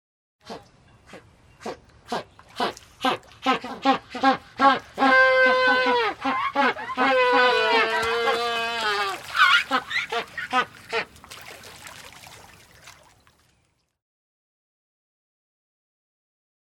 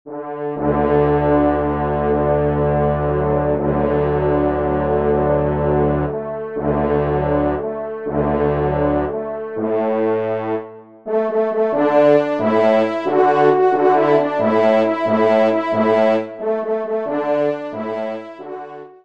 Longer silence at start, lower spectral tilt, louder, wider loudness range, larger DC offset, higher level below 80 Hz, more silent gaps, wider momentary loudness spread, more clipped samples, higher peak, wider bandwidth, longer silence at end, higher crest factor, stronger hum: first, 0.45 s vs 0.05 s; second, -2.5 dB/octave vs -9 dB/octave; second, -22 LUFS vs -18 LUFS; first, 13 LU vs 5 LU; second, under 0.1% vs 0.4%; second, -62 dBFS vs -36 dBFS; neither; first, 23 LU vs 11 LU; neither; about the same, -4 dBFS vs -2 dBFS; first, 18 kHz vs 7 kHz; first, 3.8 s vs 0.15 s; about the same, 20 dB vs 16 dB; neither